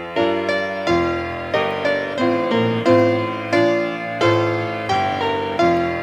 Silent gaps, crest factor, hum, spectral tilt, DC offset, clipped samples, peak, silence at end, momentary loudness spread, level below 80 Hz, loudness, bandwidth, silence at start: none; 16 dB; none; -6 dB/octave; under 0.1%; under 0.1%; -4 dBFS; 0 s; 6 LU; -50 dBFS; -19 LUFS; 10 kHz; 0 s